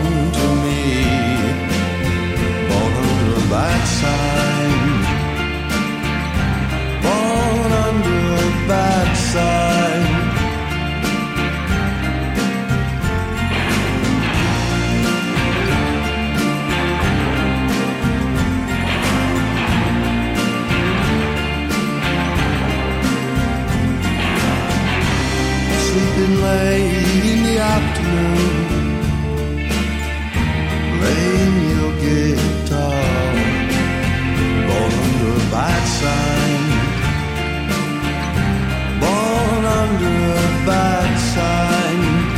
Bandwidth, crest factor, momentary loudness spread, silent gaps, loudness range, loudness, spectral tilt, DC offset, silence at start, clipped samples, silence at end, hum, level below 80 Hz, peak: 16.5 kHz; 12 dB; 4 LU; none; 2 LU; -17 LUFS; -5.5 dB/octave; under 0.1%; 0 s; under 0.1%; 0 s; none; -26 dBFS; -6 dBFS